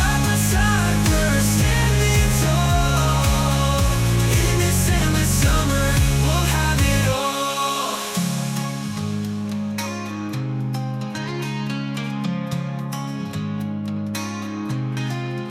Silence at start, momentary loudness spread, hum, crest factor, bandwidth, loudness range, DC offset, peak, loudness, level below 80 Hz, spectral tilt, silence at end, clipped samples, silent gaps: 0 s; 9 LU; none; 14 dB; 16 kHz; 8 LU; under 0.1%; -6 dBFS; -21 LUFS; -28 dBFS; -4.5 dB/octave; 0 s; under 0.1%; none